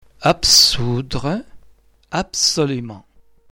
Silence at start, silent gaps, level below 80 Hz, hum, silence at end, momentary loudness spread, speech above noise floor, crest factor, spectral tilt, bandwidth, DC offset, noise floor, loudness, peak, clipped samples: 0.2 s; none; -40 dBFS; none; 0.5 s; 17 LU; 32 dB; 18 dB; -2.5 dB/octave; 18 kHz; under 0.1%; -50 dBFS; -15 LUFS; -2 dBFS; under 0.1%